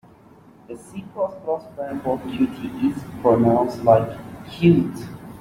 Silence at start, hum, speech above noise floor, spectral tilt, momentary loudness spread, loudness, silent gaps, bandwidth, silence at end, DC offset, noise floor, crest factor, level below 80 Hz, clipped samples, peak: 0.7 s; none; 28 dB; -8.5 dB/octave; 19 LU; -21 LUFS; none; 15.5 kHz; 0 s; under 0.1%; -49 dBFS; 20 dB; -52 dBFS; under 0.1%; -2 dBFS